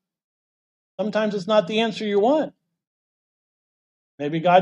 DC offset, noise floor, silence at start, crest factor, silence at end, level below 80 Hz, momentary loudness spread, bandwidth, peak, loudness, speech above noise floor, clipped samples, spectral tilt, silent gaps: under 0.1%; under -90 dBFS; 1 s; 20 dB; 0 s; -76 dBFS; 12 LU; 10 kHz; -4 dBFS; -22 LUFS; over 70 dB; under 0.1%; -6 dB/octave; 2.87-4.18 s